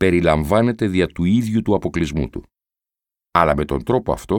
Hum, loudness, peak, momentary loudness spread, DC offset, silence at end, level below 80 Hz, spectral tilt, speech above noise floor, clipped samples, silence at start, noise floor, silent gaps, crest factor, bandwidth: none; -19 LUFS; 0 dBFS; 6 LU; under 0.1%; 0 s; -36 dBFS; -7 dB/octave; 71 dB; under 0.1%; 0 s; -89 dBFS; none; 18 dB; 17.5 kHz